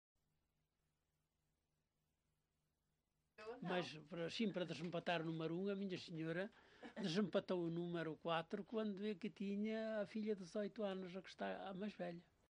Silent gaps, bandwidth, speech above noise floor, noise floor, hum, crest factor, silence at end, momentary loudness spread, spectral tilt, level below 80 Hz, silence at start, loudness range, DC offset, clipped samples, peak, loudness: none; 10 kHz; 43 dB; -89 dBFS; none; 20 dB; 0.35 s; 8 LU; -6.5 dB/octave; -84 dBFS; 3.4 s; 5 LU; under 0.1%; under 0.1%; -28 dBFS; -46 LUFS